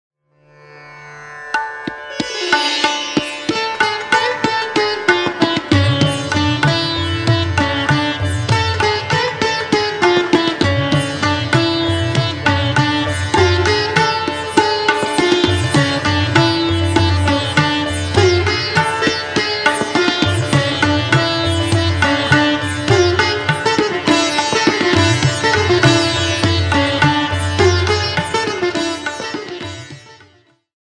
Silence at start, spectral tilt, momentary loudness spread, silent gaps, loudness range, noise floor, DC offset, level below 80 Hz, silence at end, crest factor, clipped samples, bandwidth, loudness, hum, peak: 0.7 s; -4.5 dB/octave; 6 LU; none; 3 LU; -52 dBFS; under 0.1%; -40 dBFS; 0.7 s; 16 dB; under 0.1%; 10 kHz; -15 LUFS; none; 0 dBFS